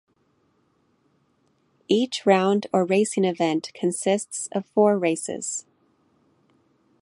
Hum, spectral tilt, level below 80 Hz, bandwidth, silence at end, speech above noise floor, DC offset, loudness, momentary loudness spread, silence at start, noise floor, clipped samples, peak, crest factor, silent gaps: none; -4.5 dB/octave; -74 dBFS; 11.5 kHz; 1.4 s; 44 dB; under 0.1%; -23 LUFS; 9 LU; 1.9 s; -67 dBFS; under 0.1%; -4 dBFS; 20 dB; none